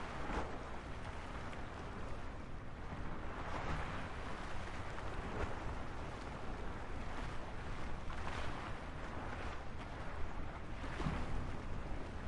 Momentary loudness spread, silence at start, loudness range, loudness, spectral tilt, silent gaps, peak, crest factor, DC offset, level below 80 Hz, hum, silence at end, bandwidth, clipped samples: 5 LU; 0 s; 2 LU; -46 LUFS; -6 dB/octave; none; -26 dBFS; 16 dB; under 0.1%; -48 dBFS; none; 0 s; 11 kHz; under 0.1%